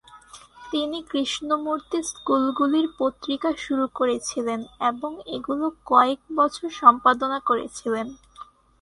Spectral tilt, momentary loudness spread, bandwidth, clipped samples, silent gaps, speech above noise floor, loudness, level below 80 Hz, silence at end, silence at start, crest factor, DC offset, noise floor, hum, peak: -3 dB/octave; 10 LU; 11.5 kHz; under 0.1%; none; 24 dB; -23 LUFS; -60 dBFS; 0.4 s; 0.15 s; 24 dB; under 0.1%; -48 dBFS; none; 0 dBFS